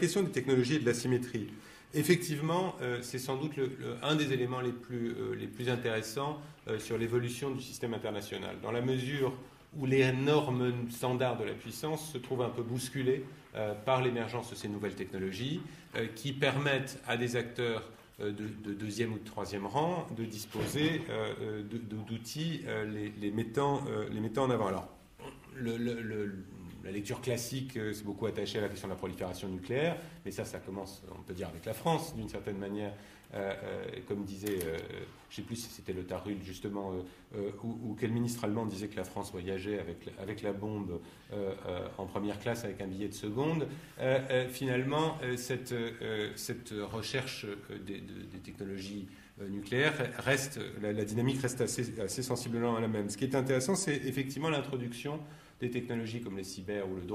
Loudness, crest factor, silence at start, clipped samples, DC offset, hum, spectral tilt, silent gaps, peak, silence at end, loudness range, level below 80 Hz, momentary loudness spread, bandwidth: -35 LUFS; 22 dB; 0 s; under 0.1%; under 0.1%; none; -5.5 dB/octave; none; -12 dBFS; 0 s; 6 LU; -64 dBFS; 11 LU; 15.5 kHz